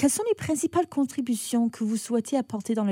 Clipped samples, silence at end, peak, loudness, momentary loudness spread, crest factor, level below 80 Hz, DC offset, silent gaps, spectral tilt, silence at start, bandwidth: under 0.1%; 0 s; -10 dBFS; -27 LUFS; 3 LU; 16 dB; -66 dBFS; under 0.1%; none; -4.5 dB/octave; 0 s; 16.5 kHz